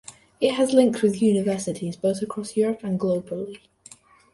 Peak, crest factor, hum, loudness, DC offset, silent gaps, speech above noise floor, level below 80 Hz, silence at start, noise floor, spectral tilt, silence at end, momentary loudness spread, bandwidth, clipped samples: -4 dBFS; 20 dB; none; -23 LUFS; under 0.1%; none; 28 dB; -62 dBFS; 0.1 s; -51 dBFS; -6 dB/octave; 0.75 s; 11 LU; 11.5 kHz; under 0.1%